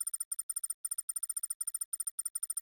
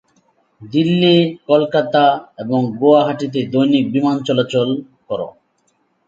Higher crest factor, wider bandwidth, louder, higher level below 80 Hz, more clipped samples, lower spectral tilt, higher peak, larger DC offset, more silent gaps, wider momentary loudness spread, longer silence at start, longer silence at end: about the same, 14 dB vs 16 dB; first, over 20 kHz vs 7.8 kHz; second, -36 LUFS vs -16 LUFS; second, under -90 dBFS vs -62 dBFS; neither; second, 9 dB/octave vs -7 dB/octave; second, -24 dBFS vs 0 dBFS; neither; first, 0.25-0.31 s, 0.43-0.49 s, 0.74-0.84 s, 1.03-1.08 s, 1.55-1.60 s, 1.85-1.92 s, 2.11-2.18 s, 2.30-2.35 s vs none; second, 1 LU vs 13 LU; second, 0 s vs 0.6 s; second, 0 s vs 0.75 s